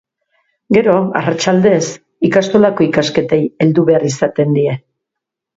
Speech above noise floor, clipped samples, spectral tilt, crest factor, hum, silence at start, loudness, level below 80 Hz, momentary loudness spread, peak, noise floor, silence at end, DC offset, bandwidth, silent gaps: 68 dB; under 0.1%; -6 dB/octave; 14 dB; none; 0.7 s; -13 LUFS; -52 dBFS; 5 LU; 0 dBFS; -81 dBFS; 0.8 s; under 0.1%; 8 kHz; none